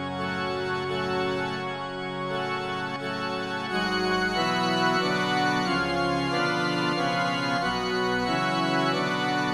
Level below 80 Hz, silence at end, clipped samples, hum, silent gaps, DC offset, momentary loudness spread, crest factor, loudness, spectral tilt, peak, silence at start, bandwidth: -54 dBFS; 0 s; under 0.1%; none; none; under 0.1%; 6 LU; 14 dB; -26 LUFS; -4.5 dB/octave; -12 dBFS; 0 s; 14 kHz